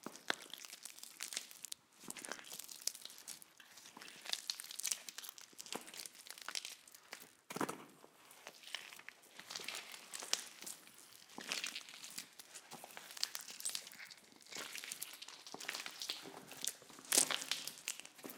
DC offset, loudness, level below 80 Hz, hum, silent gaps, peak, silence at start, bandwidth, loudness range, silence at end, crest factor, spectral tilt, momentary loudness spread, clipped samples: under 0.1%; -44 LUFS; under -90 dBFS; none; none; -8 dBFS; 0 s; 18 kHz; 8 LU; 0 s; 40 dB; 0.5 dB/octave; 14 LU; under 0.1%